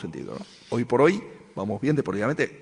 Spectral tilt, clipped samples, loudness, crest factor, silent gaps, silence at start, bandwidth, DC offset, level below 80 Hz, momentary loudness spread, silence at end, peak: -7 dB/octave; under 0.1%; -25 LUFS; 18 dB; none; 0 s; 10.5 kHz; under 0.1%; -60 dBFS; 17 LU; 0 s; -8 dBFS